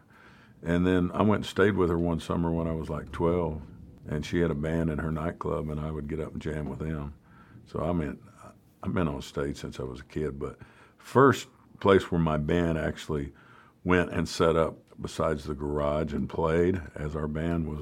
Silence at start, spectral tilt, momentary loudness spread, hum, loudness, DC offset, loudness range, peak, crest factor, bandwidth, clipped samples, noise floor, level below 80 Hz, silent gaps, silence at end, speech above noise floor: 0.25 s; -7 dB/octave; 13 LU; none; -29 LUFS; under 0.1%; 7 LU; -6 dBFS; 22 dB; 15 kHz; under 0.1%; -55 dBFS; -44 dBFS; none; 0 s; 27 dB